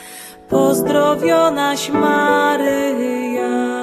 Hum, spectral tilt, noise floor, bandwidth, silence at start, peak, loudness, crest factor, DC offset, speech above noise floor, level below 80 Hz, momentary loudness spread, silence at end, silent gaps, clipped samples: none; -4.5 dB/octave; -36 dBFS; 14 kHz; 0 s; -2 dBFS; -16 LUFS; 14 dB; under 0.1%; 20 dB; -54 dBFS; 6 LU; 0 s; none; under 0.1%